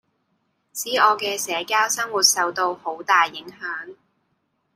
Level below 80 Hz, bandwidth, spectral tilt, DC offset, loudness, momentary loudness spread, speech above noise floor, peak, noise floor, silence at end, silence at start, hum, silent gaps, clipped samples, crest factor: -76 dBFS; 16 kHz; 0.5 dB/octave; under 0.1%; -20 LUFS; 15 LU; 49 dB; -2 dBFS; -71 dBFS; 0.8 s; 0.75 s; none; none; under 0.1%; 20 dB